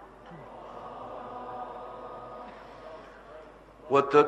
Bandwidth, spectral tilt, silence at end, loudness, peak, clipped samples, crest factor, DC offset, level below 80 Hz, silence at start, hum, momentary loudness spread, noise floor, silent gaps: 8.2 kHz; -6 dB/octave; 0 s; -33 LUFS; -6 dBFS; under 0.1%; 26 dB; under 0.1%; -62 dBFS; 0 s; none; 21 LU; -50 dBFS; none